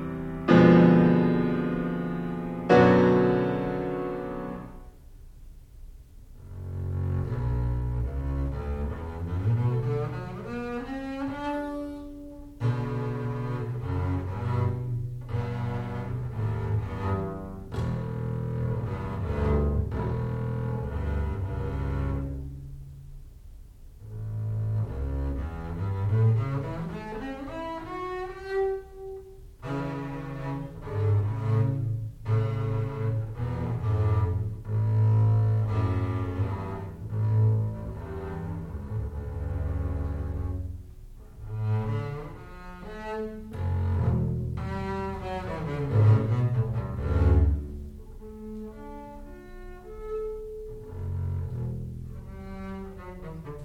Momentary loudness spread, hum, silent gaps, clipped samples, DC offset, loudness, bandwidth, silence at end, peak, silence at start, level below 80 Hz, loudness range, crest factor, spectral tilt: 17 LU; none; none; under 0.1%; under 0.1%; -28 LUFS; 6.2 kHz; 0 s; -6 dBFS; 0 s; -38 dBFS; 10 LU; 22 dB; -9.5 dB/octave